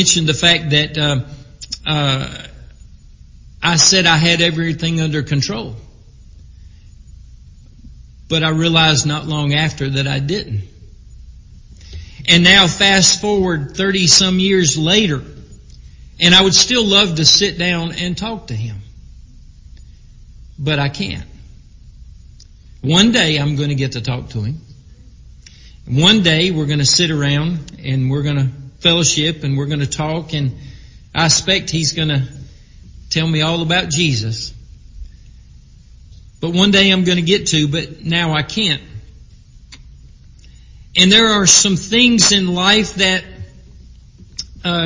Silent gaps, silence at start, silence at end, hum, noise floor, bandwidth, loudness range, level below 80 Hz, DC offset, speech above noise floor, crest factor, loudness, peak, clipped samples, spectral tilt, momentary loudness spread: none; 0 s; 0 s; none; -42 dBFS; 7.8 kHz; 10 LU; -38 dBFS; under 0.1%; 27 dB; 16 dB; -13 LUFS; 0 dBFS; under 0.1%; -3 dB/octave; 16 LU